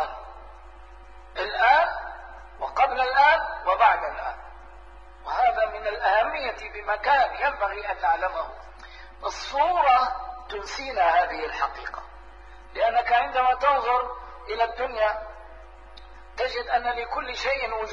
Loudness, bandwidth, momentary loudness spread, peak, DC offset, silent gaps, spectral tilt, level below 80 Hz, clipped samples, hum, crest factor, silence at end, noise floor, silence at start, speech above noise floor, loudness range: -24 LUFS; 7.6 kHz; 19 LU; -6 dBFS; 0.3%; none; -3 dB/octave; -48 dBFS; under 0.1%; none; 18 dB; 0 s; -46 dBFS; 0 s; 22 dB; 4 LU